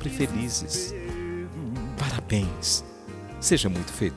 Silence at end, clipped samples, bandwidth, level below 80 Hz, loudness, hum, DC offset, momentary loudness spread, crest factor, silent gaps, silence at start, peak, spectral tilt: 0 s; under 0.1%; 11 kHz; -42 dBFS; -27 LUFS; none; under 0.1%; 11 LU; 20 dB; none; 0 s; -8 dBFS; -4 dB/octave